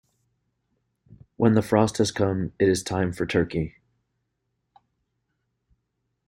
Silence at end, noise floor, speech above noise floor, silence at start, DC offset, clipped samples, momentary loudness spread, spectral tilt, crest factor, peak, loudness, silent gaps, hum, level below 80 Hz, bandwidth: 2.6 s; -77 dBFS; 55 dB; 1.4 s; under 0.1%; under 0.1%; 7 LU; -6 dB/octave; 22 dB; -4 dBFS; -24 LUFS; none; none; -54 dBFS; 16 kHz